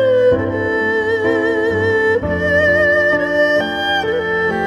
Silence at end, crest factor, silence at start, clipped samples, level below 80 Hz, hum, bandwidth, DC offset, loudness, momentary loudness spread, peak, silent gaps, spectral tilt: 0 s; 12 dB; 0 s; under 0.1%; -42 dBFS; none; 12.5 kHz; under 0.1%; -15 LUFS; 5 LU; -4 dBFS; none; -6 dB/octave